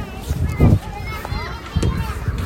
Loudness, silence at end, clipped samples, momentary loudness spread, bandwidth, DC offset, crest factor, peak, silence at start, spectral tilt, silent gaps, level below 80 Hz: -21 LUFS; 0 s; under 0.1%; 11 LU; 16.5 kHz; under 0.1%; 18 dB; 0 dBFS; 0 s; -7 dB/octave; none; -26 dBFS